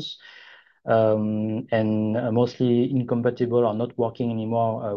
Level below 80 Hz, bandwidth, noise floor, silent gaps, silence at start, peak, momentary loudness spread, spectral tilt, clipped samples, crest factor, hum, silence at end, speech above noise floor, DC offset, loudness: -62 dBFS; 6.8 kHz; -50 dBFS; none; 0 s; -8 dBFS; 6 LU; -9 dB/octave; under 0.1%; 16 dB; none; 0 s; 27 dB; under 0.1%; -23 LUFS